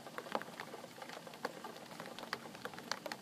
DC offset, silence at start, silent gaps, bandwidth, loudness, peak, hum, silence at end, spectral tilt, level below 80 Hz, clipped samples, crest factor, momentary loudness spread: under 0.1%; 0 s; none; 15.5 kHz; -46 LUFS; -18 dBFS; none; 0 s; -3 dB/octave; -86 dBFS; under 0.1%; 30 dB; 6 LU